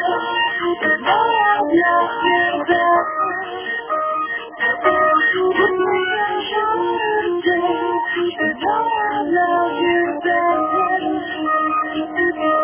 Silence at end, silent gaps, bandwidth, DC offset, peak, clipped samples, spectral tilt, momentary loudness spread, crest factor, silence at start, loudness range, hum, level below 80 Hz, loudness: 0 s; none; 3.5 kHz; under 0.1%; -2 dBFS; under 0.1%; -7.5 dB/octave; 6 LU; 16 dB; 0 s; 2 LU; none; -54 dBFS; -18 LUFS